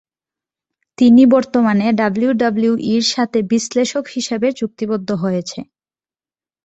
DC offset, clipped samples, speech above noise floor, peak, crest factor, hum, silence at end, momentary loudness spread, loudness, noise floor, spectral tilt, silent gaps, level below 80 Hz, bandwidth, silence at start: under 0.1%; under 0.1%; over 75 dB; -2 dBFS; 14 dB; none; 1 s; 11 LU; -16 LUFS; under -90 dBFS; -5 dB/octave; none; -58 dBFS; 8.2 kHz; 1 s